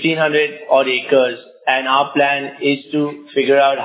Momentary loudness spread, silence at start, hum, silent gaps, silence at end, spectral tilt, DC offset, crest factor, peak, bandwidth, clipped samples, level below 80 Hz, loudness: 7 LU; 0 s; none; none; 0 s; -8.5 dB/octave; under 0.1%; 16 dB; 0 dBFS; 4 kHz; under 0.1%; -74 dBFS; -16 LUFS